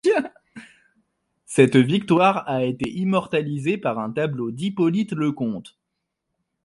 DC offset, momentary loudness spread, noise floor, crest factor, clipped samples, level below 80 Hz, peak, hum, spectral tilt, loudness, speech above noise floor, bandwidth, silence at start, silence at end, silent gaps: under 0.1%; 10 LU; -80 dBFS; 20 dB; under 0.1%; -62 dBFS; -2 dBFS; none; -6.5 dB/octave; -22 LUFS; 59 dB; 11.5 kHz; 0.05 s; 0.95 s; none